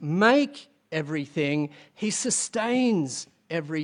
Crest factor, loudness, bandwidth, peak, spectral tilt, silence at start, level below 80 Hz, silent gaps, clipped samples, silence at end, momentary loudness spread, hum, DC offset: 20 dB; -26 LUFS; 11 kHz; -6 dBFS; -4 dB/octave; 0 s; -72 dBFS; none; under 0.1%; 0 s; 13 LU; none; under 0.1%